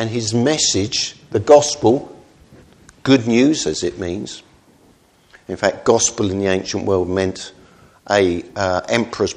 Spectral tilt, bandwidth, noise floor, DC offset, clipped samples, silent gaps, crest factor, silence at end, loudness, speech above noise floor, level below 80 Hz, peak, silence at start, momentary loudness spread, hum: -4 dB/octave; 11 kHz; -53 dBFS; under 0.1%; under 0.1%; none; 18 dB; 0 s; -17 LUFS; 36 dB; -50 dBFS; 0 dBFS; 0 s; 13 LU; none